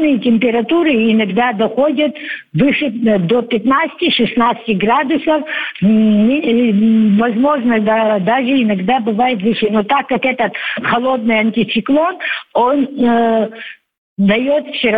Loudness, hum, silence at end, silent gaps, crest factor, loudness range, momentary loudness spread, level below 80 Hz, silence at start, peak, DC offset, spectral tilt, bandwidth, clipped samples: -14 LUFS; none; 0 s; 13.98-14.16 s; 12 dB; 2 LU; 5 LU; -52 dBFS; 0 s; -2 dBFS; under 0.1%; -8.5 dB/octave; 4.9 kHz; under 0.1%